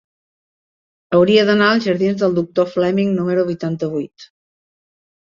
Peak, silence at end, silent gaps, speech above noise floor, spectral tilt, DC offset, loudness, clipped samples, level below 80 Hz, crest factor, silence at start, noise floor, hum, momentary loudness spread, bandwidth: -2 dBFS; 1.15 s; none; over 74 dB; -7 dB/octave; under 0.1%; -16 LUFS; under 0.1%; -58 dBFS; 16 dB; 1.1 s; under -90 dBFS; none; 10 LU; 7.4 kHz